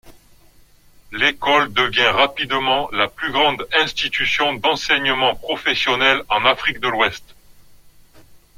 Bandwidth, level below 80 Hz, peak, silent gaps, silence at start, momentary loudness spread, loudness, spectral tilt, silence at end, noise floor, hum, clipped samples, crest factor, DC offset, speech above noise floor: 16.5 kHz; -48 dBFS; 0 dBFS; none; 0.05 s; 5 LU; -17 LUFS; -3 dB/octave; 0.2 s; -50 dBFS; 50 Hz at -55 dBFS; under 0.1%; 20 dB; under 0.1%; 31 dB